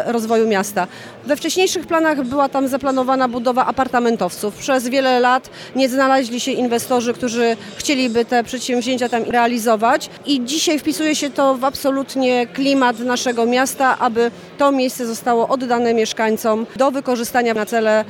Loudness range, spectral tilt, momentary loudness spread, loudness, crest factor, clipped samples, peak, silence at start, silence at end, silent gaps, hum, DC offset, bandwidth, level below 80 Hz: 1 LU; -3 dB/octave; 5 LU; -18 LUFS; 14 dB; under 0.1%; -2 dBFS; 0 s; 0 s; none; none; under 0.1%; 18 kHz; -58 dBFS